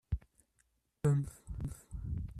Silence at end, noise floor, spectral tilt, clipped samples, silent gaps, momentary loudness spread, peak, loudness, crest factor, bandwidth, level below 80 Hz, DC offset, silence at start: 0 s; -77 dBFS; -8.5 dB/octave; under 0.1%; none; 12 LU; -20 dBFS; -38 LUFS; 18 dB; 13 kHz; -48 dBFS; under 0.1%; 0.1 s